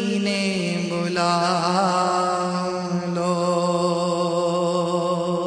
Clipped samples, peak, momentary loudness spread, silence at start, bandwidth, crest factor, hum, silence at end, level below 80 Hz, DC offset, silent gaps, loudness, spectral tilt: under 0.1%; -6 dBFS; 4 LU; 0 s; 10 kHz; 14 dB; none; 0 s; -64 dBFS; under 0.1%; none; -22 LUFS; -5 dB/octave